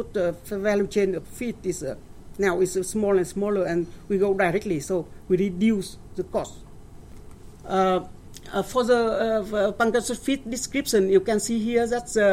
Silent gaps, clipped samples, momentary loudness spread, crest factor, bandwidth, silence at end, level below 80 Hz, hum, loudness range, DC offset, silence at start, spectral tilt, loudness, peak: none; under 0.1%; 10 LU; 18 dB; 16.5 kHz; 0 s; -48 dBFS; none; 4 LU; under 0.1%; 0 s; -5 dB/octave; -24 LUFS; -6 dBFS